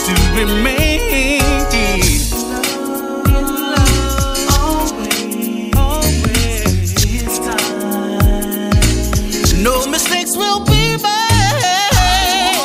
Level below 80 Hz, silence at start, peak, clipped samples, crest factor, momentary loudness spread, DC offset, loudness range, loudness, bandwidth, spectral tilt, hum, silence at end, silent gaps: -18 dBFS; 0 s; 0 dBFS; under 0.1%; 12 dB; 6 LU; under 0.1%; 3 LU; -14 LUFS; 16 kHz; -4 dB/octave; none; 0 s; none